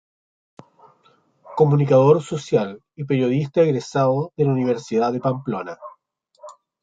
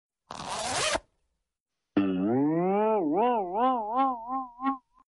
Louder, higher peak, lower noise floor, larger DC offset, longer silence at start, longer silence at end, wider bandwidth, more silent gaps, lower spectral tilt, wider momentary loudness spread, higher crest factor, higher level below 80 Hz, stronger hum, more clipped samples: first, -20 LUFS vs -28 LUFS; first, -4 dBFS vs -14 dBFS; second, -61 dBFS vs -87 dBFS; neither; first, 1.45 s vs 0.3 s; about the same, 0.3 s vs 0.3 s; second, 7.8 kHz vs 11.5 kHz; second, none vs 1.60-1.66 s; first, -8 dB/octave vs -4.5 dB/octave; first, 15 LU vs 8 LU; about the same, 18 dB vs 14 dB; about the same, -64 dBFS vs -60 dBFS; neither; neither